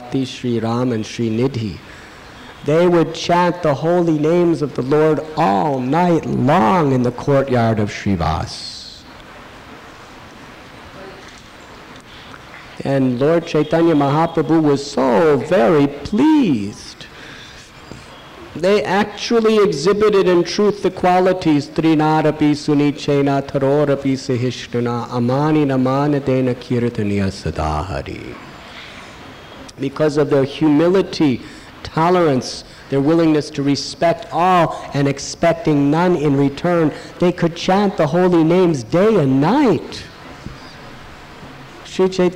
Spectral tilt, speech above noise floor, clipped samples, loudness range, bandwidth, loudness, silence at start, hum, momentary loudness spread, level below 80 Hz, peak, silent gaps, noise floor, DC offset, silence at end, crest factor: -6.5 dB/octave; 23 dB; under 0.1%; 7 LU; 13.5 kHz; -16 LUFS; 0 s; none; 22 LU; -44 dBFS; -10 dBFS; none; -39 dBFS; under 0.1%; 0 s; 8 dB